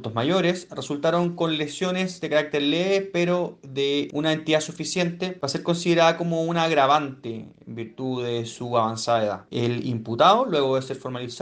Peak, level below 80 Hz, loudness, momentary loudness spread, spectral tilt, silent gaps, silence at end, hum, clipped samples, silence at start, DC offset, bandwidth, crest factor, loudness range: -4 dBFS; -68 dBFS; -23 LUFS; 12 LU; -5 dB/octave; none; 0 s; none; under 0.1%; 0 s; under 0.1%; 9.8 kHz; 20 dB; 2 LU